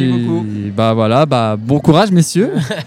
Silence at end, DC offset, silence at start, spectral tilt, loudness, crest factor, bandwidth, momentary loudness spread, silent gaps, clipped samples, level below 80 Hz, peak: 0 s; under 0.1%; 0 s; -6.5 dB/octave; -13 LUFS; 12 dB; 15 kHz; 7 LU; none; 0.2%; -48 dBFS; 0 dBFS